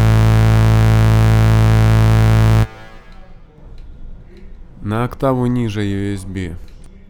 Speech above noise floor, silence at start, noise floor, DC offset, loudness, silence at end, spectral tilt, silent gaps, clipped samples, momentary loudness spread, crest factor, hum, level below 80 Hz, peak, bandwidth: 19 dB; 0 s; -37 dBFS; under 0.1%; -14 LUFS; 0.35 s; -7.5 dB/octave; none; under 0.1%; 13 LU; 12 dB; none; -22 dBFS; -2 dBFS; 13 kHz